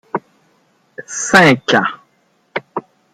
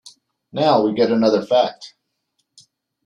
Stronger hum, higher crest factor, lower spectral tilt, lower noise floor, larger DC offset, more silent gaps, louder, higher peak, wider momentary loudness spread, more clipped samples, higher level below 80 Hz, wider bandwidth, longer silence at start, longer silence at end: neither; about the same, 18 dB vs 18 dB; second, -3.5 dB/octave vs -6 dB/octave; second, -59 dBFS vs -72 dBFS; neither; neither; first, -13 LUFS vs -17 LUFS; about the same, 0 dBFS vs -2 dBFS; first, 20 LU vs 11 LU; neither; first, -56 dBFS vs -66 dBFS; first, 16 kHz vs 10 kHz; about the same, 0.15 s vs 0.05 s; second, 0.35 s vs 1.2 s